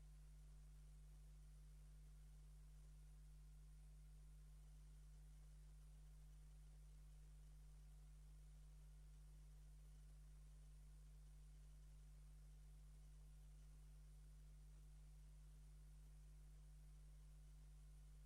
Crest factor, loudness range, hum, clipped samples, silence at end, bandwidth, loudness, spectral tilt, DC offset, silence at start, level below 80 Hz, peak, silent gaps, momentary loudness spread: 6 dB; 0 LU; 50 Hz at -65 dBFS; under 0.1%; 0 s; 12.5 kHz; -67 LUFS; -5.5 dB/octave; under 0.1%; 0 s; -64 dBFS; -56 dBFS; none; 0 LU